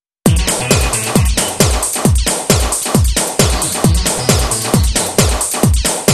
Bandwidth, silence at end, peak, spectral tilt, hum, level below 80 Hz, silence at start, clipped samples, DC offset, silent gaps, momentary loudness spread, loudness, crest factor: 13.5 kHz; 0 s; 0 dBFS; -3.5 dB/octave; none; -20 dBFS; 0.25 s; under 0.1%; under 0.1%; none; 1 LU; -13 LUFS; 14 dB